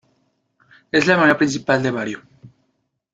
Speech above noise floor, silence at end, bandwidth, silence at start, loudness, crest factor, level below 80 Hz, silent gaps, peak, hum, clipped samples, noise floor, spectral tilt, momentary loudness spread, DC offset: 53 dB; 0.65 s; 9 kHz; 0.95 s; -18 LUFS; 18 dB; -60 dBFS; none; -2 dBFS; none; under 0.1%; -71 dBFS; -5 dB/octave; 13 LU; under 0.1%